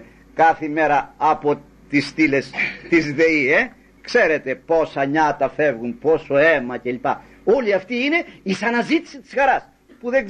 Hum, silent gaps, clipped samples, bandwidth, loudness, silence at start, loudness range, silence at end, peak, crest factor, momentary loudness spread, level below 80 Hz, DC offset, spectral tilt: none; none; under 0.1%; 9.8 kHz; -19 LUFS; 0 s; 2 LU; 0 s; -4 dBFS; 16 dB; 8 LU; -52 dBFS; under 0.1%; -5.5 dB/octave